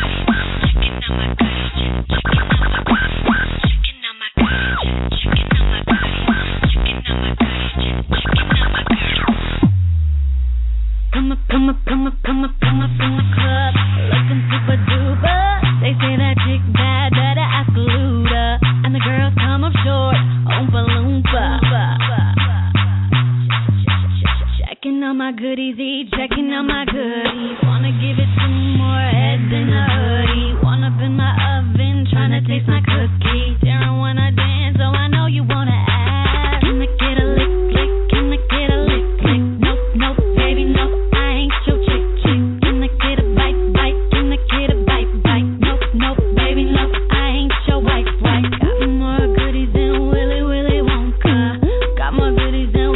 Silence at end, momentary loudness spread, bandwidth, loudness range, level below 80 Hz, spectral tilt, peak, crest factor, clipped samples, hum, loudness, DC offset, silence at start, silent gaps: 0 s; 4 LU; 4.1 kHz; 2 LU; -20 dBFS; -10 dB/octave; -2 dBFS; 12 dB; under 0.1%; none; -16 LUFS; under 0.1%; 0 s; none